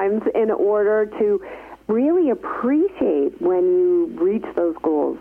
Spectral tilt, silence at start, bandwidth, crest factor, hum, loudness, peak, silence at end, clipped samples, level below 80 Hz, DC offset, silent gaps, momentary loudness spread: -9 dB/octave; 0 s; 3.4 kHz; 10 dB; none; -20 LUFS; -10 dBFS; 0 s; under 0.1%; -56 dBFS; under 0.1%; none; 6 LU